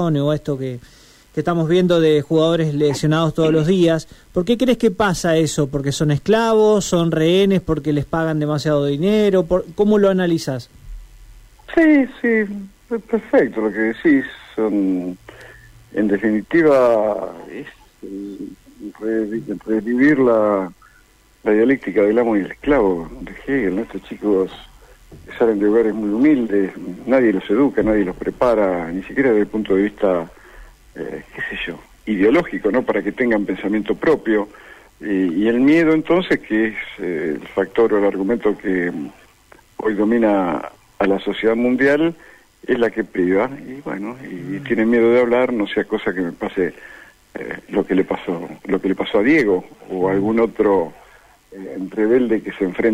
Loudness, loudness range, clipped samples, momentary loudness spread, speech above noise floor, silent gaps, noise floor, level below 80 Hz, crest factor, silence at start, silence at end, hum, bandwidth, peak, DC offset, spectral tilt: -18 LUFS; 4 LU; under 0.1%; 15 LU; 35 dB; none; -52 dBFS; -46 dBFS; 14 dB; 0 s; 0 s; none; 15 kHz; -4 dBFS; under 0.1%; -6.5 dB/octave